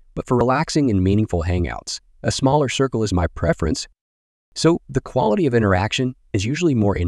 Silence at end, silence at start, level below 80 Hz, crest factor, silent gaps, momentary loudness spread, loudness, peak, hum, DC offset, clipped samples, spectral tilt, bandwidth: 0 s; 0.15 s; -36 dBFS; 18 dB; 4.01-4.52 s; 8 LU; -20 LUFS; -2 dBFS; none; under 0.1%; under 0.1%; -6 dB/octave; 11.5 kHz